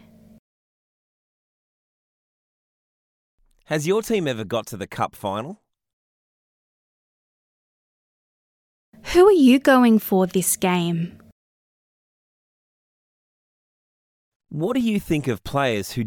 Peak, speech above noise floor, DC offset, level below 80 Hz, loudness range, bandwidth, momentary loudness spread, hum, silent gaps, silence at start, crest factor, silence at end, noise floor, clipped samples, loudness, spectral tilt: -2 dBFS; over 71 dB; under 0.1%; -54 dBFS; 15 LU; 18.5 kHz; 14 LU; none; 5.93-8.93 s, 11.32-14.40 s; 3.7 s; 22 dB; 0 s; under -90 dBFS; under 0.1%; -20 LUFS; -5 dB/octave